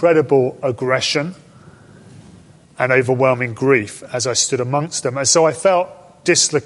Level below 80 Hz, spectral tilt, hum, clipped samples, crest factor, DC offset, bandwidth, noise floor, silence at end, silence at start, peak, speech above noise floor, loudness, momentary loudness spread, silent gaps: -58 dBFS; -3.5 dB/octave; none; under 0.1%; 16 dB; under 0.1%; 11.5 kHz; -45 dBFS; 0 s; 0 s; -2 dBFS; 28 dB; -17 LUFS; 9 LU; none